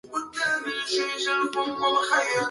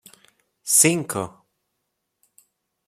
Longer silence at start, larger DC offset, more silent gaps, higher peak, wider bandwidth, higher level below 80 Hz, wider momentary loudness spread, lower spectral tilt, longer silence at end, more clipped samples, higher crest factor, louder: second, 0.05 s vs 0.65 s; neither; neither; second, -10 dBFS vs -2 dBFS; second, 11.5 kHz vs 16.5 kHz; about the same, -70 dBFS vs -68 dBFS; second, 5 LU vs 20 LU; about the same, -1.5 dB/octave vs -2.5 dB/octave; second, 0 s vs 1.6 s; neither; second, 16 dB vs 24 dB; second, -25 LUFS vs -18 LUFS